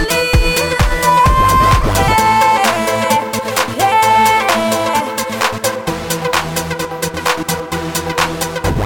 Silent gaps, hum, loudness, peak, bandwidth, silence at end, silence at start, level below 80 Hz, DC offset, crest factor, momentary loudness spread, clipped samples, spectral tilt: none; none; -14 LUFS; 0 dBFS; 17.5 kHz; 0 s; 0 s; -24 dBFS; under 0.1%; 14 dB; 9 LU; under 0.1%; -3.5 dB/octave